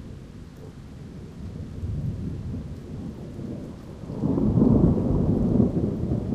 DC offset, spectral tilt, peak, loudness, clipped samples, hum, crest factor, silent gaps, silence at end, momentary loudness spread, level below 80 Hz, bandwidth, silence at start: under 0.1%; -10.5 dB/octave; -6 dBFS; -25 LUFS; under 0.1%; none; 20 dB; none; 0 s; 22 LU; -36 dBFS; 9 kHz; 0 s